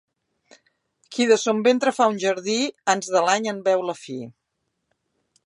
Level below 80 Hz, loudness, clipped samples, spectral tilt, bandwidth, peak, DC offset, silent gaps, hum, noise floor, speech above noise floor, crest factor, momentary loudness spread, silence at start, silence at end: -78 dBFS; -21 LUFS; under 0.1%; -3 dB/octave; 11.5 kHz; -4 dBFS; under 0.1%; none; none; -77 dBFS; 56 dB; 20 dB; 14 LU; 1.1 s; 1.15 s